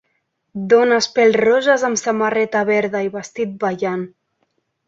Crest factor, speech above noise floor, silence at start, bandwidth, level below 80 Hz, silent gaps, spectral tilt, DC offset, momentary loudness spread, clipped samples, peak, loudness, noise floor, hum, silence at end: 16 dB; 53 dB; 0.55 s; 7.8 kHz; -64 dBFS; none; -4 dB/octave; under 0.1%; 12 LU; under 0.1%; -2 dBFS; -17 LUFS; -69 dBFS; none; 0.8 s